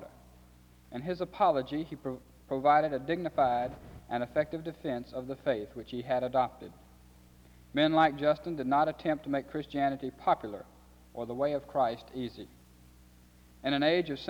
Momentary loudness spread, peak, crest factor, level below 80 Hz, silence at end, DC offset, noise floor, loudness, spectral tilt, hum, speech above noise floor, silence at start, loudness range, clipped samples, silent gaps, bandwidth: 15 LU; -12 dBFS; 20 dB; -60 dBFS; 0 s; under 0.1%; -58 dBFS; -31 LUFS; -7 dB/octave; none; 27 dB; 0 s; 5 LU; under 0.1%; none; over 20 kHz